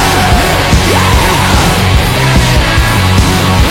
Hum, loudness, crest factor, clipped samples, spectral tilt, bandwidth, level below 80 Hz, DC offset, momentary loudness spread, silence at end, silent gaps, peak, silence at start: none; -8 LUFS; 8 dB; 0.3%; -4.5 dB/octave; 17 kHz; -14 dBFS; under 0.1%; 1 LU; 0 s; none; 0 dBFS; 0 s